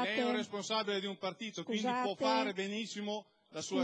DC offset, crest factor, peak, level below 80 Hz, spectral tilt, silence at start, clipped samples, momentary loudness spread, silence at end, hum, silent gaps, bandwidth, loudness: under 0.1%; 18 dB; -18 dBFS; -90 dBFS; -3.5 dB/octave; 0 s; under 0.1%; 10 LU; 0 s; none; none; 10 kHz; -36 LUFS